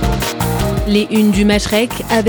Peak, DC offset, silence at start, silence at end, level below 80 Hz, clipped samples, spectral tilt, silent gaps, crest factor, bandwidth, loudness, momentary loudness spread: -2 dBFS; under 0.1%; 0 s; 0 s; -26 dBFS; under 0.1%; -5 dB/octave; none; 12 dB; over 20 kHz; -14 LUFS; 5 LU